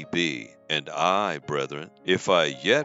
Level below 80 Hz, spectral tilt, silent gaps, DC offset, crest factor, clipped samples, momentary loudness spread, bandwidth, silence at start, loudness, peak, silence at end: -68 dBFS; -4 dB/octave; none; under 0.1%; 20 dB; under 0.1%; 10 LU; 8 kHz; 0 s; -25 LUFS; -6 dBFS; 0 s